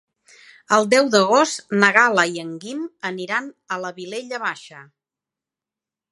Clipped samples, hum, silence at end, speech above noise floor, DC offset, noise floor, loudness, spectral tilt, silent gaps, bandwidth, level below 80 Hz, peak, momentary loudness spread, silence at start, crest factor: under 0.1%; none; 1.3 s; 69 dB; under 0.1%; -89 dBFS; -19 LUFS; -3.5 dB/octave; none; 11.5 kHz; -76 dBFS; 0 dBFS; 15 LU; 0.7 s; 22 dB